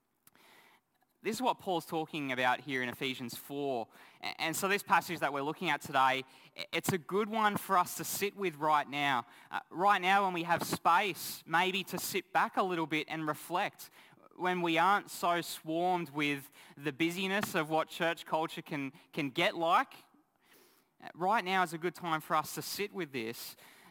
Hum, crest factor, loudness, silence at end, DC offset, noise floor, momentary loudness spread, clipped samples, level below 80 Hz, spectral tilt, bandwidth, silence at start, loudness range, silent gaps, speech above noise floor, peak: none; 20 dB; -33 LUFS; 0.25 s; under 0.1%; -72 dBFS; 12 LU; under 0.1%; -80 dBFS; -3.5 dB/octave; 19 kHz; 1.25 s; 4 LU; none; 38 dB; -14 dBFS